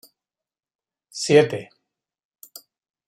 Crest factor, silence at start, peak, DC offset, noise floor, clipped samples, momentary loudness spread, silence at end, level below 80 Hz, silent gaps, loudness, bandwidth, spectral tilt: 22 dB; 1.15 s; -2 dBFS; under 0.1%; -85 dBFS; under 0.1%; 26 LU; 1.45 s; -70 dBFS; none; -19 LUFS; 16 kHz; -4.5 dB/octave